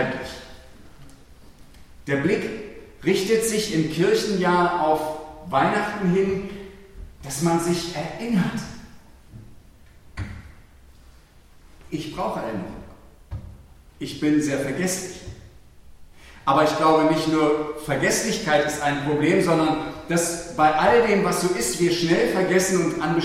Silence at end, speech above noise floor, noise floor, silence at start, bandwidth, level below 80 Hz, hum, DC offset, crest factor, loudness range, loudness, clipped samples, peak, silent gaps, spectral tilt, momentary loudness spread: 0 s; 29 dB; -50 dBFS; 0 s; 16 kHz; -48 dBFS; none; under 0.1%; 20 dB; 14 LU; -22 LUFS; under 0.1%; -4 dBFS; none; -4.5 dB/octave; 18 LU